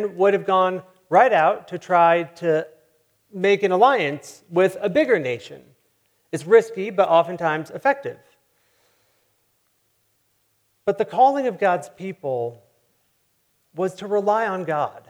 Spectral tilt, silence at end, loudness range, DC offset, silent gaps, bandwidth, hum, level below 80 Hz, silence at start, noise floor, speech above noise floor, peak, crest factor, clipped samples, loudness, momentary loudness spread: -5.5 dB/octave; 0.1 s; 7 LU; under 0.1%; none; 14.5 kHz; none; -72 dBFS; 0 s; -67 dBFS; 47 dB; -2 dBFS; 20 dB; under 0.1%; -20 LUFS; 15 LU